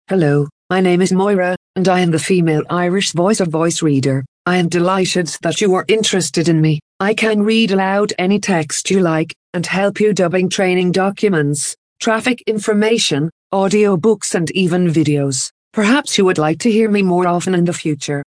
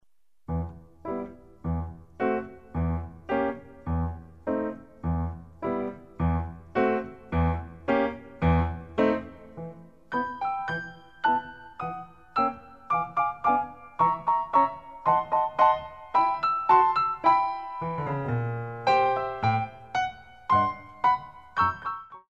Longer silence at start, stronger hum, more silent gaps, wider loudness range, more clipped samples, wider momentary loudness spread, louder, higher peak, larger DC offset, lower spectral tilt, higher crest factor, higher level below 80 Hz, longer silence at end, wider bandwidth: second, 0.1 s vs 0.5 s; neither; first, 0.52-0.69 s, 1.57-1.74 s, 4.28-4.45 s, 6.82-7.00 s, 9.36-9.53 s, 11.78-11.96 s, 13.32-13.50 s, 15.51-15.71 s vs none; second, 1 LU vs 8 LU; neither; second, 5 LU vs 14 LU; first, -15 LUFS vs -27 LUFS; first, -2 dBFS vs -8 dBFS; second, under 0.1% vs 0.1%; second, -5 dB/octave vs -8 dB/octave; second, 14 dB vs 20 dB; second, -58 dBFS vs -44 dBFS; about the same, 0.1 s vs 0.15 s; first, 10.5 kHz vs 7.4 kHz